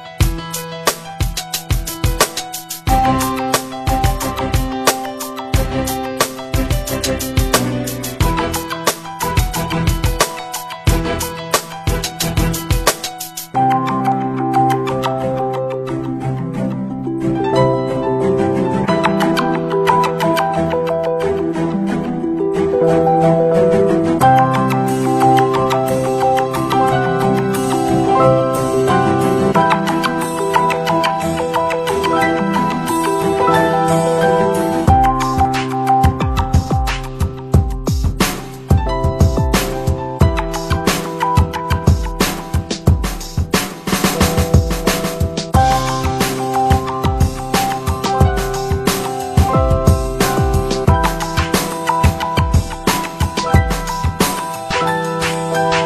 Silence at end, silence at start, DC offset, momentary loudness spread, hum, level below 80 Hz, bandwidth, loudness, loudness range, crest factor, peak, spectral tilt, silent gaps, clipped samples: 0 s; 0 s; under 0.1%; 7 LU; none; -26 dBFS; 15 kHz; -16 LUFS; 4 LU; 16 dB; 0 dBFS; -5 dB/octave; none; under 0.1%